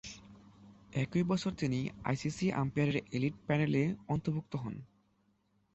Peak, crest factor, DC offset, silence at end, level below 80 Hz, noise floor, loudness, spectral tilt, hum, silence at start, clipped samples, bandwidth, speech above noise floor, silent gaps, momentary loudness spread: -18 dBFS; 18 dB; under 0.1%; 0.9 s; -62 dBFS; -74 dBFS; -34 LUFS; -7 dB/octave; none; 0.05 s; under 0.1%; 8.2 kHz; 40 dB; none; 9 LU